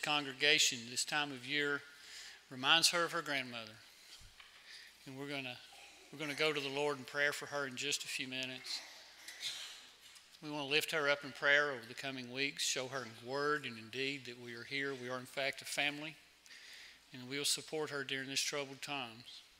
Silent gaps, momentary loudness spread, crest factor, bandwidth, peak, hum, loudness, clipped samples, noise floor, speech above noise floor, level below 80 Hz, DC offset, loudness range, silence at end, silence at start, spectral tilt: none; 22 LU; 28 dB; 16 kHz; -12 dBFS; none; -36 LUFS; under 0.1%; -60 dBFS; 22 dB; -80 dBFS; under 0.1%; 6 LU; 0.15 s; 0 s; -1.5 dB/octave